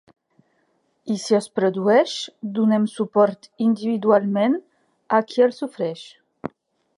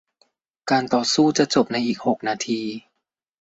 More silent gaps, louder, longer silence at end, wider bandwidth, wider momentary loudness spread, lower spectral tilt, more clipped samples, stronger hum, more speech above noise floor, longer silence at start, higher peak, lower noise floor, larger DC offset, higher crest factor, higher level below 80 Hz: neither; about the same, -21 LUFS vs -21 LUFS; about the same, 0.5 s vs 0.6 s; first, 11 kHz vs 8 kHz; first, 15 LU vs 12 LU; first, -6 dB/octave vs -4 dB/octave; neither; neither; second, 47 dB vs 58 dB; first, 1.05 s vs 0.65 s; about the same, -2 dBFS vs -4 dBFS; second, -67 dBFS vs -78 dBFS; neither; about the same, 18 dB vs 18 dB; second, -72 dBFS vs -64 dBFS